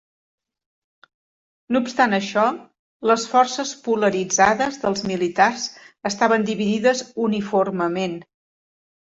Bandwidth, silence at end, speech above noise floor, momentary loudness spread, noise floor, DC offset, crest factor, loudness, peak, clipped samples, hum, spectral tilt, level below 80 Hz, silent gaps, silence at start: 8 kHz; 0.95 s; over 70 dB; 10 LU; under -90 dBFS; under 0.1%; 18 dB; -21 LUFS; -4 dBFS; under 0.1%; none; -4 dB/octave; -62 dBFS; 2.79-3.00 s; 1.7 s